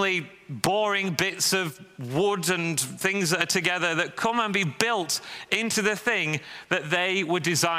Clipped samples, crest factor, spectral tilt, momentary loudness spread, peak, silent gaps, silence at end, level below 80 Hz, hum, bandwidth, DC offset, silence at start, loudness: under 0.1%; 26 dB; -3 dB/octave; 6 LU; 0 dBFS; none; 0 s; -66 dBFS; none; 16 kHz; under 0.1%; 0 s; -25 LUFS